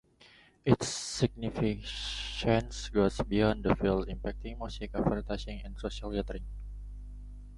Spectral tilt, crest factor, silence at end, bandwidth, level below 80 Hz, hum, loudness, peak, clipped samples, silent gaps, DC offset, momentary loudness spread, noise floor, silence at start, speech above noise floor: -5.5 dB/octave; 24 dB; 0 s; 11.5 kHz; -42 dBFS; 50 Hz at -40 dBFS; -32 LUFS; -8 dBFS; under 0.1%; none; under 0.1%; 17 LU; -60 dBFS; 0.2 s; 29 dB